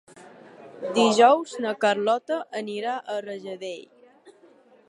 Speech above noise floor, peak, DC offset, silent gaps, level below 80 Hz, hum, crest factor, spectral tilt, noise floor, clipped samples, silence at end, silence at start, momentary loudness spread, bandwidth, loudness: 32 dB; -4 dBFS; under 0.1%; none; -82 dBFS; none; 22 dB; -3.5 dB/octave; -55 dBFS; under 0.1%; 0.6 s; 0.15 s; 18 LU; 11.5 kHz; -23 LUFS